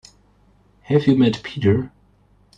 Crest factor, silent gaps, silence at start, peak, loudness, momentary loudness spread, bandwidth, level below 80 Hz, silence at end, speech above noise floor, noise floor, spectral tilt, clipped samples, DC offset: 18 dB; none; 0.9 s; -4 dBFS; -19 LUFS; 7 LU; 8.2 kHz; -54 dBFS; 0.7 s; 39 dB; -56 dBFS; -8 dB/octave; under 0.1%; under 0.1%